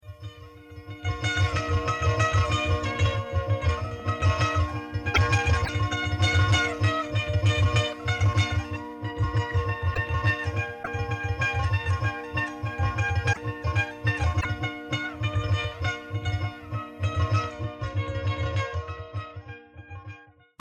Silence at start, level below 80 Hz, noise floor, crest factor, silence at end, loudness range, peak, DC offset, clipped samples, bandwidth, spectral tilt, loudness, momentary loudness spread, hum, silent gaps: 0.05 s; -40 dBFS; -48 dBFS; 16 dB; 0.35 s; 5 LU; -10 dBFS; under 0.1%; under 0.1%; 9.4 kHz; -5.5 dB/octave; -27 LUFS; 12 LU; none; none